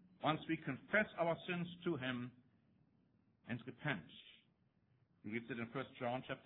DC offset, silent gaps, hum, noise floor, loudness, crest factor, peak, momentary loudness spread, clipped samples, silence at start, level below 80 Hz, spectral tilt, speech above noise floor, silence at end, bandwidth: under 0.1%; none; none; -77 dBFS; -42 LUFS; 24 dB; -20 dBFS; 14 LU; under 0.1%; 0.2 s; -78 dBFS; -4 dB/octave; 34 dB; 0.05 s; 4 kHz